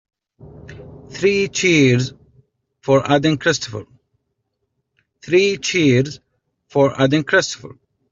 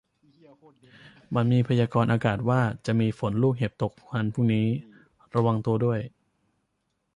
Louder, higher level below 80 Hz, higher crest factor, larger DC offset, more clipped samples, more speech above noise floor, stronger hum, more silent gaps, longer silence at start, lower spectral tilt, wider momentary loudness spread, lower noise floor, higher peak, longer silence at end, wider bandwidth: first, -17 LUFS vs -26 LUFS; about the same, -54 dBFS vs -58 dBFS; about the same, 16 dB vs 18 dB; neither; neither; first, 57 dB vs 51 dB; neither; neither; second, 0.45 s vs 1.05 s; second, -5 dB/octave vs -8.5 dB/octave; first, 18 LU vs 7 LU; about the same, -73 dBFS vs -76 dBFS; first, -2 dBFS vs -8 dBFS; second, 0.4 s vs 1.05 s; second, 7.8 kHz vs 10 kHz